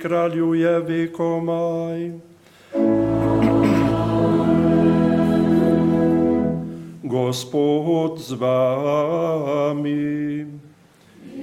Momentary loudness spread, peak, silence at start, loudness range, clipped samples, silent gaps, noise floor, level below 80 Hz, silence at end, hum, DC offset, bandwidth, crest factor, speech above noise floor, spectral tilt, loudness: 10 LU; -4 dBFS; 0 s; 4 LU; under 0.1%; none; -50 dBFS; -46 dBFS; 0 s; none; under 0.1%; 13 kHz; 14 dB; 30 dB; -7.5 dB/octave; -20 LUFS